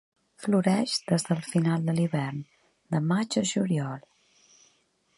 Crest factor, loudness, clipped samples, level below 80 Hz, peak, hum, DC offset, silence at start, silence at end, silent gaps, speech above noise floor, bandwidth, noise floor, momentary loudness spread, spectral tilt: 20 dB; -27 LUFS; under 0.1%; -72 dBFS; -10 dBFS; none; under 0.1%; 0.4 s; 1.2 s; none; 42 dB; 11.5 kHz; -68 dBFS; 10 LU; -5.5 dB/octave